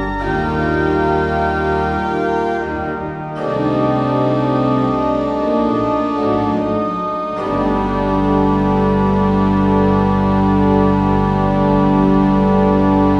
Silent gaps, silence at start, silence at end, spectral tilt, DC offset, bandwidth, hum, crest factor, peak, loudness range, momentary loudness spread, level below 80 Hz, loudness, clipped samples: none; 0 s; 0 s; -9 dB/octave; under 0.1%; 6.8 kHz; none; 14 dB; -2 dBFS; 4 LU; 6 LU; -30 dBFS; -16 LUFS; under 0.1%